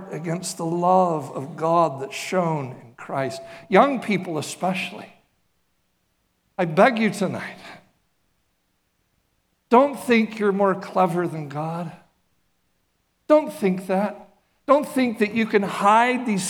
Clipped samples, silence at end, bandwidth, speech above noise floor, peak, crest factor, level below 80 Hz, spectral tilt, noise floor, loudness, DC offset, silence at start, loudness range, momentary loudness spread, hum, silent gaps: under 0.1%; 0 s; 18 kHz; 49 dB; 0 dBFS; 22 dB; -72 dBFS; -5.5 dB/octave; -70 dBFS; -22 LUFS; under 0.1%; 0 s; 3 LU; 15 LU; none; none